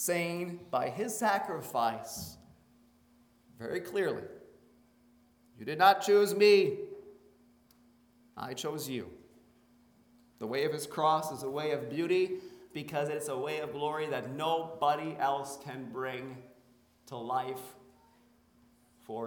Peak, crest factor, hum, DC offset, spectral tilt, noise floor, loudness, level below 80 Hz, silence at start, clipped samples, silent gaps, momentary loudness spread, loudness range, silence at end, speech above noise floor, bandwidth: -10 dBFS; 24 dB; none; under 0.1%; -4 dB/octave; -65 dBFS; -32 LUFS; -74 dBFS; 0 s; under 0.1%; none; 19 LU; 12 LU; 0 s; 34 dB; over 20 kHz